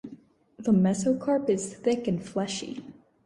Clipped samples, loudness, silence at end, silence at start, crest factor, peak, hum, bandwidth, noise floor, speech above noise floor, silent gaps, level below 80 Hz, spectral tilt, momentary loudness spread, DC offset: under 0.1%; -27 LUFS; 0.35 s; 0.05 s; 16 dB; -12 dBFS; none; 11.5 kHz; -51 dBFS; 25 dB; none; -64 dBFS; -6 dB/octave; 14 LU; under 0.1%